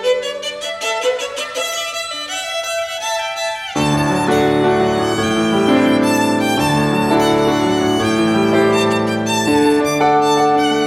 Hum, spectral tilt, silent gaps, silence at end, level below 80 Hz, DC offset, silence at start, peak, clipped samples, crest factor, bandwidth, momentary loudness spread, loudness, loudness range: none; -4.5 dB/octave; none; 0 s; -46 dBFS; under 0.1%; 0 s; -2 dBFS; under 0.1%; 14 dB; 16 kHz; 8 LU; -16 LUFS; 5 LU